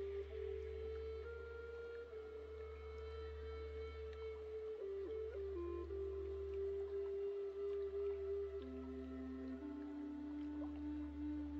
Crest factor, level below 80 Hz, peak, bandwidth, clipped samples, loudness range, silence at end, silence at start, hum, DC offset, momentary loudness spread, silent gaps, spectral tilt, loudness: 10 dB; -56 dBFS; -36 dBFS; 7.2 kHz; under 0.1%; 5 LU; 0 s; 0 s; none; under 0.1%; 7 LU; none; -7.5 dB/octave; -48 LUFS